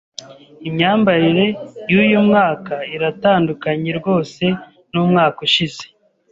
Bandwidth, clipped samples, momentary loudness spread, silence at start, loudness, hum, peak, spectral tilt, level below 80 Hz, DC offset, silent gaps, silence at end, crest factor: 7.8 kHz; under 0.1%; 13 LU; 0.2 s; -16 LUFS; none; -2 dBFS; -6.5 dB/octave; -56 dBFS; under 0.1%; none; 0.45 s; 14 dB